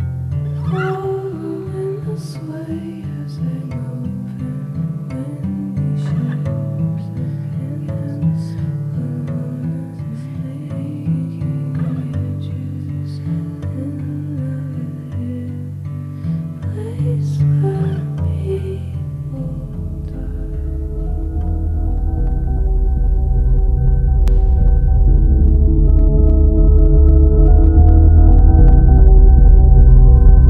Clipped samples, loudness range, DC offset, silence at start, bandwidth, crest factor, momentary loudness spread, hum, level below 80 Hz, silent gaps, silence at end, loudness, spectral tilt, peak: under 0.1%; 13 LU; under 0.1%; 0 s; 3 kHz; 14 dB; 15 LU; none; -14 dBFS; none; 0 s; -17 LUFS; -10.5 dB/octave; 0 dBFS